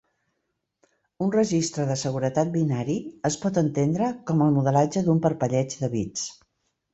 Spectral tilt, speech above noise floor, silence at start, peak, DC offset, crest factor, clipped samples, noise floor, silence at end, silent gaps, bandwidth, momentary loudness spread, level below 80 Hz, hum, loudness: -6.5 dB/octave; 54 dB; 1.2 s; -8 dBFS; under 0.1%; 18 dB; under 0.1%; -78 dBFS; 0.6 s; none; 8.2 kHz; 7 LU; -60 dBFS; none; -24 LUFS